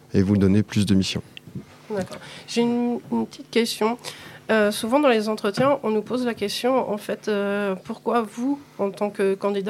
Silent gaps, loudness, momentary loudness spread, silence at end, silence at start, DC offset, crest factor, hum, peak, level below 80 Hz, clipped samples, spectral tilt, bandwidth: none; -23 LUFS; 12 LU; 0 s; 0.15 s; under 0.1%; 18 dB; none; -6 dBFS; -62 dBFS; under 0.1%; -5.5 dB/octave; 15.5 kHz